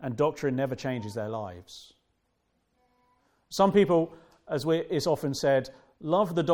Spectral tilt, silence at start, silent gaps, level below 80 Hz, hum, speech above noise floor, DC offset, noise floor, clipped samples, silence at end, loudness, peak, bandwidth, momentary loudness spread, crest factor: -6 dB/octave; 0 s; none; -62 dBFS; none; 48 dB; under 0.1%; -75 dBFS; under 0.1%; 0 s; -28 LUFS; -8 dBFS; 17.5 kHz; 17 LU; 20 dB